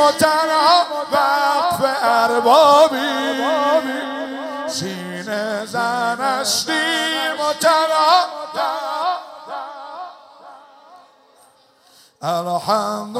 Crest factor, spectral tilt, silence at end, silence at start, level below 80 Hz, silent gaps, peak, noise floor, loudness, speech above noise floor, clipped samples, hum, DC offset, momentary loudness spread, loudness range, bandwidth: 18 dB; -2.5 dB/octave; 0 s; 0 s; -68 dBFS; none; 0 dBFS; -53 dBFS; -17 LUFS; 36 dB; under 0.1%; none; under 0.1%; 15 LU; 14 LU; 16 kHz